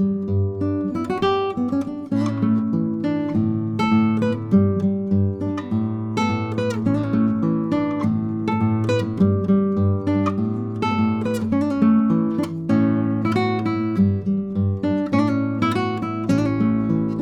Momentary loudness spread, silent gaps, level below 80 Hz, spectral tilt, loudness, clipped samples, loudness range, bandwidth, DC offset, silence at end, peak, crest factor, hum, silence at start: 5 LU; none; -52 dBFS; -8.5 dB/octave; -21 LUFS; under 0.1%; 2 LU; 9 kHz; under 0.1%; 0 s; -6 dBFS; 14 dB; none; 0 s